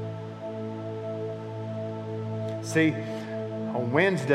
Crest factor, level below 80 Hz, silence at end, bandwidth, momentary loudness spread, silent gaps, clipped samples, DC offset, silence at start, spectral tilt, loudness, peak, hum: 20 dB; -72 dBFS; 0 s; 13.5 kHz; 12 LU; none; under 0.1%; under 0.1%; 0 s; -6.5 dB/octave; -30 LUFS; -8 dBFS; none